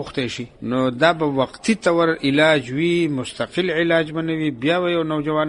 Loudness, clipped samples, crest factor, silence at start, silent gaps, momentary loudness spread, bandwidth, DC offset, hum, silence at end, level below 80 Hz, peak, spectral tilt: -20 LUFS; under 0.1%; 18 dB; 0 s; none; 8 LU; 11 kHz; under 0.1%; none; 0 s; -54 dBFS; -2 dBFS; -5.5 dB/octave